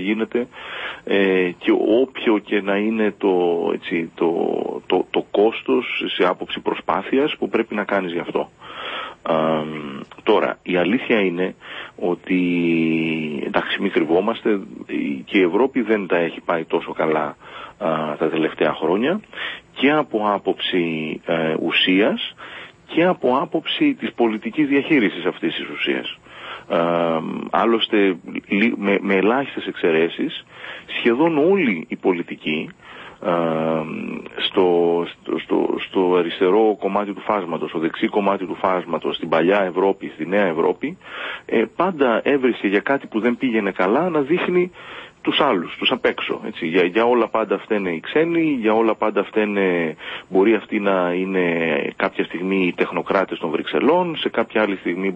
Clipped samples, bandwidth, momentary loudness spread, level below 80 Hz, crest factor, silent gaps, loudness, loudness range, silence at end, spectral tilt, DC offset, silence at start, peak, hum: under 0.1%; 7.6 kHz; 9 LU; -62 dBFS; 18 dB; none; -20 LUFS; 2 LU; 0 s; -7.5 dB/octave; under 0.1%; 0 s; -2 dBFS; none